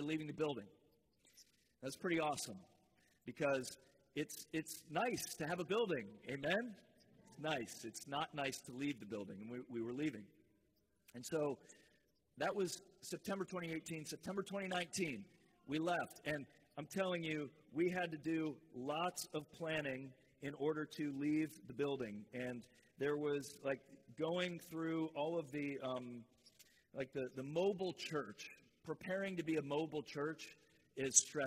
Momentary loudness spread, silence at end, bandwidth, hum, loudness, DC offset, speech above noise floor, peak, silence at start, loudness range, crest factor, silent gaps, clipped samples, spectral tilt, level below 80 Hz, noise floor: 12 LU; 0 s; 16 kHz; none; -43 LUFS; under 0.1%; 37 dB; -14 dBFS; 0 s; 3 LU; 30 dB; none; under 0.1%; -3.5 dB/octave; -80 dBFS; -80 dBFS